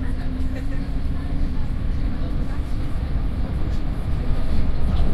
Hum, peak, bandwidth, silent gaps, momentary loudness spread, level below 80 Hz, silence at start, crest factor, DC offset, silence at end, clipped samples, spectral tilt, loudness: none; -6 dBFS; 5.2 kHz; none; 3 LU; -22 dBFS; 0 s; 14 dB; under 0.1%; 0 s; under 0.1%; -8 dB/octave; -27 LUFS